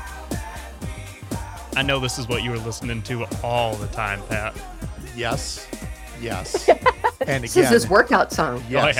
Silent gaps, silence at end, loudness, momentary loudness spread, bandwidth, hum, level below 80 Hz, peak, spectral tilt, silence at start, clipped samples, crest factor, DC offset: none; 0 s; -22 LUFS; 18 LU; 18 kHz; none; -38 dBFS; -2 dBFS; -4.5 dB/octave; 0 s; under 0.1%; 20 dB; under 0.1%